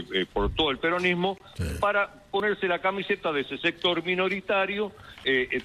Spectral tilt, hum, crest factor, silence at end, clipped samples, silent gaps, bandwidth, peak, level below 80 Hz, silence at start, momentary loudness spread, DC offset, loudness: -5.5 dB/octave; none; 16 dB; 0 s; under 0.1%; none; 13 kHz; -10 dBFS; -46 dBFS; 0 s; 6 LU; under 0.1%; -27 LUFS